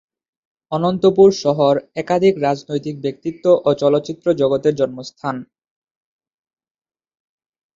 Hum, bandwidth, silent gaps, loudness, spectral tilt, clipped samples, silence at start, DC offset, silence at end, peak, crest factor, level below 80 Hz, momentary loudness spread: none; 7.6 kHz; none; -17 LUFS; -6.5 dB/octave; under 0.1%; 0.7 s; under 0.1%; 2.3 s; -2 dBFS; 16 dB; -58 dBFS; 13 LU